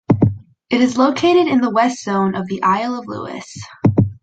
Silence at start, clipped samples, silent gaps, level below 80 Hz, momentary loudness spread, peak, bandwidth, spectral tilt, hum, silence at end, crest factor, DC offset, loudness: 0.1 s; under 0.1%; none; -42 dBFS; 14 LU; -2 dBFS; 9 kHz; -6.5 dB/octave; none; 0.1 s; 14 dB; under 0.1%; -17 LUFS